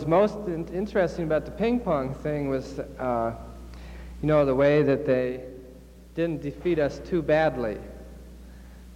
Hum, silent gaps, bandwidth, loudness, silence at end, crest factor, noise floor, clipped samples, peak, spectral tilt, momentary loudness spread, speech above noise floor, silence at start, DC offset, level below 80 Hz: none; none; 15.5 kHz; -26 LUFS; 0 s; 16 dB; -47 dBFS; under 0.1%; -10 dBFS; -8 dB/octave; 21 LU; 22 dB; 0 s; under 0.1%; -44 dBFS